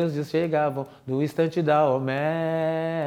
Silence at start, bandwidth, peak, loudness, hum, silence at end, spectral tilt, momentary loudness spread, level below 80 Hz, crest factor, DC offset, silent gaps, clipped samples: 0 s; 15.5 kHz; -8 dBFS; -25 LUFS; none; 0 s; -7.5 dB/octave; 7 LU; -68 dBFS; 16 dB; under 0.1%; none; under 0.1%